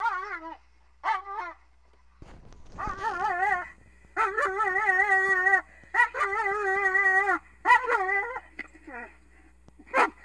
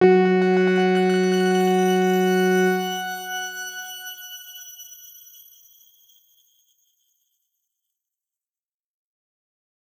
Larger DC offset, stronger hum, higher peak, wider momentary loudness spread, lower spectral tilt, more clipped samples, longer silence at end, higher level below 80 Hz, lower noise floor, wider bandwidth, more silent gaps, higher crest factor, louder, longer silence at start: neither; neither; second, -8 dBFS vs -4 dBFS; about the same, 20 LU vs 19 LU; second, -3.5 dB/octave vs -5.5 dB/octave; neither; second, 0.15 s vs 4.95 s; first, -56 dBFS vs -76 dBFS; second, -61 dBFS vs under -90 dBFS; second, 11 kHz vs over 20 kHz; neither; about the same, 20 dB vs 18 dB; second, -25 LUFS vs -20 LUFS; about the same, 0 s vs 0 s